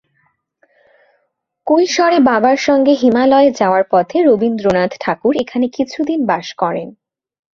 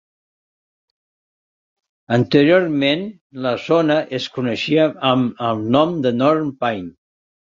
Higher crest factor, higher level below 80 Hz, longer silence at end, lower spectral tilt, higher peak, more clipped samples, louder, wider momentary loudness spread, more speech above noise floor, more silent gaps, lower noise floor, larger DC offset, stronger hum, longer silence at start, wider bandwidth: about the same, 14 dB vs 18 dB; about the same, -54 dBFS vs -58 dBFS; about the same, 0.65 s vs 0.7 s; second, -5 dB/octave vs -7 dB/octave; about the same, 0 dBFS vs -2 dBFS; neither; first, -14 LUFS vs -18 LUFS; about the same, 8 LU vs 9 LU; second, 54 dB vs over 73 dB; second, none vs 3.21-3.30 s; second, -67 dBFS vs under -90 dBFS; neither; neither; second, 1.65 s vs 2.1 s; about the same, 7.4 kHz vs 7.6 kHz